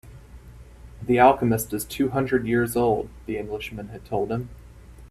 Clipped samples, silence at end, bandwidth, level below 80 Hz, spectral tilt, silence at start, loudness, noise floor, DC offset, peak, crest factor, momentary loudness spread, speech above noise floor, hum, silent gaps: under 0.1%; 0.05 s; 15.5 kHz; -46 dBFS; -6 dB/octave; 0.05 s; -23 LUFS; -44 dBFS; under 0.1%; -2 dBFS; 22 dB; 16 LU; 21 dB; none; none